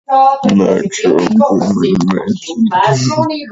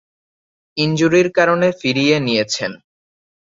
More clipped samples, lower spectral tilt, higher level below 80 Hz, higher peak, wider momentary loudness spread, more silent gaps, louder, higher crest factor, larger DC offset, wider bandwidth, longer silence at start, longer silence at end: neither; about the same, -6 dB/octave vs -5 dB/octave; first, -48 dBFS vs -56 dBFS; about the same, 0 dBFS vs 0 dBFS; second, 5 LU vs 8 LU; neither; first, -12 LUFS vs -16 LUFS; second, 12 dB vs 18 dB; neither; about the same, 8 kHz vs 7.8 kHz; second, 0.1 s vs 0.75 s; second, 0 s vs 0.85 s